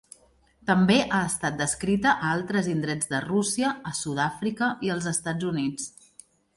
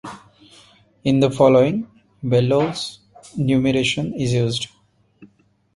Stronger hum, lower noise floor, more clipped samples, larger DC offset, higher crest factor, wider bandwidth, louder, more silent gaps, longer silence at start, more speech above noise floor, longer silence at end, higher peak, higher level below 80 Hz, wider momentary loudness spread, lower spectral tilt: neither; first, -61 dBFS vs -57 dBFS; neither; neither; about the same, 18 dB vs 18 dB; about the same, 11.5 kHz vs 11.5 kHz; second, -26 LUFS vs -19 LUFS; neither; first, 0.65 s vs 0.05 s; second, 35 dB vs 40 dB; first, 0.65 s vs 0.5 s; second, -8 dBFS vs -2 dBFS; about the same, -56 dBFS vs -52 dBFS; second, 8 LU vs 17 LU; second, -4.5 dB/octave vs -6 dB/octave